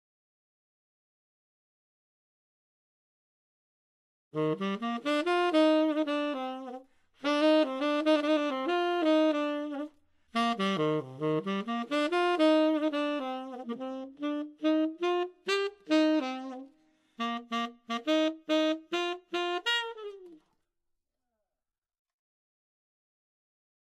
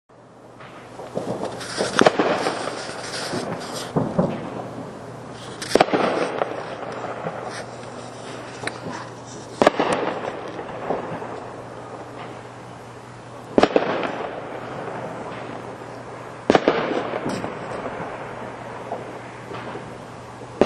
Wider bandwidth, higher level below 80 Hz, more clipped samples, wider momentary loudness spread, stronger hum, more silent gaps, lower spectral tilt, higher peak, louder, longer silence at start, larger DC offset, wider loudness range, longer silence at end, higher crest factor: second, 11 kHz vs 12.5 kHz; second, -80 dBFS vs -56 dBFS; neither; second, 13 LU vs 18 LU; neither; neither; about the same, -5 dB/octave vs -5 dB/octave; second, -14 dBFS vs 0 dBFS; second, -30 LUFS vs -25 LUFS; first, 4.35 s vs 0.1 s; neither; about the same, 7 LU vs 7 LU; first, 3.65 s vs 0 s; second, 18 dB vs 26 dB